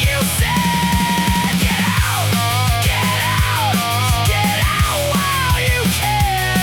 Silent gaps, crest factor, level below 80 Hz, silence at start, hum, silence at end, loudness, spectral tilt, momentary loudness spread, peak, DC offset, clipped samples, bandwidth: none; 12 dB; -26 dBFS; 0 s; none; 0 s; -16 LUFS; -4 dB/octave; 1 LU; -4 dBFS; under 0.1%; under 0.1%; 18 kHz